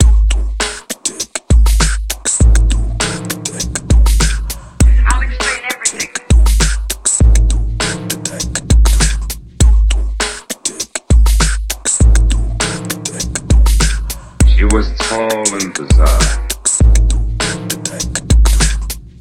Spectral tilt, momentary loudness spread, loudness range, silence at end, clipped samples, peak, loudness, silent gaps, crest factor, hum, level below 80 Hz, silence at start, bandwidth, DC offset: -3.5 dB/octave; 9 LU; 1 LU; 0.15 s; under 0.1%; 0 dBFS; -14 LUFS; none; 12 dB; none; -12 dBFS; 0 s; 14.5 kHz; under 0.1%